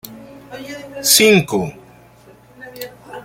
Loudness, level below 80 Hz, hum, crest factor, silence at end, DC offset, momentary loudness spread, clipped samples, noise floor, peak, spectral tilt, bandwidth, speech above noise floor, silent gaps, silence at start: -13 LUFS; -56 dBFS; none; 20 dB; 0.05 s; under 0.1%; 26 LU; under 0.1%; -46 dBFS; 0 dBFS; -2.5 dB/octave; 17 kHz; 31 dB; none; 0.05 s